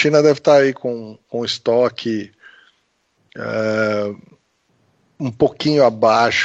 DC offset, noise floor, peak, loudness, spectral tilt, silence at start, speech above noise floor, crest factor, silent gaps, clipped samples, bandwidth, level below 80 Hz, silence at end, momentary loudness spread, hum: under 0.1%; -65 dBFS; -2 dBFS; -17 LUFS; -5 dB/octave; 0 s; 48 dB; 16 dB; none; under 0.1%; 8 kHz; -58 dBFS; 0 s; 15 LU; none